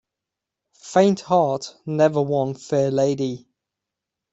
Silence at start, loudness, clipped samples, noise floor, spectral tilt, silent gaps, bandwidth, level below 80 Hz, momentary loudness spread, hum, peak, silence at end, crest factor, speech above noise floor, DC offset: 0.85 s; -21 LUFS; under 0.1%; -85 dBFS; -6.5 dB/octave; none; 8.2 kHz; -64 dBFS; 10 LU; none; -4 dBFS; 0.95 s; 20 dB; 65 dB; under 0.1%